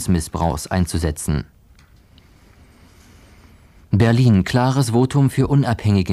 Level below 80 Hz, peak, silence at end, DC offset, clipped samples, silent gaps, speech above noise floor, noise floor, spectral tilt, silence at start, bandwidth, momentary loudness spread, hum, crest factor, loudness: -36 dBFS; -2 dBFS; 0 s; under 0.1%; under 0.1%; none; 33 dB; -50 dBFS; -6.5 dB/octave; 0 s; 14.5 kHz; 8 LU; none; 16 dB; -18 LUFS